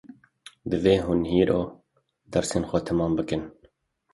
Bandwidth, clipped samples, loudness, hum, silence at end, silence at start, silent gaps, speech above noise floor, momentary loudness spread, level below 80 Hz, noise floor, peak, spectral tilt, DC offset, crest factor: 11.5 kHz; under 0.1%; -25 LUFS; none; 0.6 s; 0.1 s; none; 41 dB; 11 LU; -46 dBFS; -65 dBFS; -6 dBFS; -6 dB/octave; under 0.1%; 20 dB